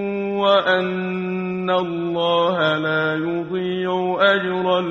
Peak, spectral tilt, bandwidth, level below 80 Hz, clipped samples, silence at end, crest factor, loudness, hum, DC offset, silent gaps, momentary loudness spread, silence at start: -4 dBFS; -7 dB/octave; 7.2 kHz; -62 dBFS; under 0.1%; 0 s; 16 dB; -20 LUFS; none; under 0.1%; none; 7 LU; 0 s